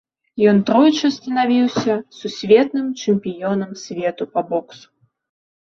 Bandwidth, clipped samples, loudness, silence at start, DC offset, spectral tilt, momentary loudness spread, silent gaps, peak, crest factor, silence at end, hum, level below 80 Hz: 7.2 kHz; under 0.1%; -18 LUFS; 0.35 s; under 0.1%; -6 dB/octave; 11 LU; none; -2 dBFS; 16 dB; 0.85 s; none; -62 dBFS